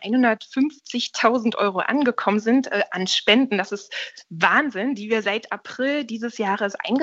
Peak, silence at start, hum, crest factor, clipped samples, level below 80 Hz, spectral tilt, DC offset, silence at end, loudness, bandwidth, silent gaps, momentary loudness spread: -2 dBFS; 0 s; none; 20 dB; under 0.1%; -72 dBFS; -4 dB/octave; under 0.1%; 0 s; -22 LUFS; 8 kHz; none; 10 LU